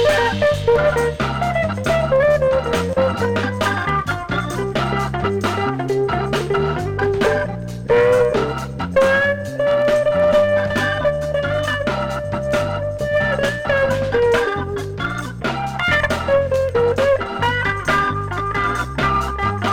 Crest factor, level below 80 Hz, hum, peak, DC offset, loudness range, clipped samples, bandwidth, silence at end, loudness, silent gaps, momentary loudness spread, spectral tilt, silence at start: 14 dB; -36 dBFS; none; -4 dBFS; under 0.1%; 3 LU; under 0.1%; 16.5 kHz; 0 s; -18 LUFS; none; 7 LU; -5.5 dB/octave; 0 s